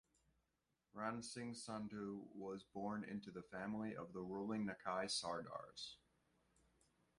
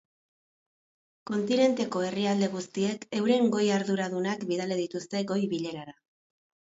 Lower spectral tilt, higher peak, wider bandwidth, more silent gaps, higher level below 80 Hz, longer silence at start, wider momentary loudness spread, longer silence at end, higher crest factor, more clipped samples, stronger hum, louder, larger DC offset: second, -4 dB/octave vs -5.5 dB/octave; second, -28 dBFS vs -12 dBFS; first, 11.5 kHz vs 8 kHz; neither; second, -80 dBFS vs -74 dBFS; second, 0.95 s vs 1.25 s; about the same, 10 LU vs 9 LU; first, 1.25 s vs 0.85 s; about the same, 22 dB vs 18 dB; neither; neither; second, -48 LUFS vs -28 LUFS; neither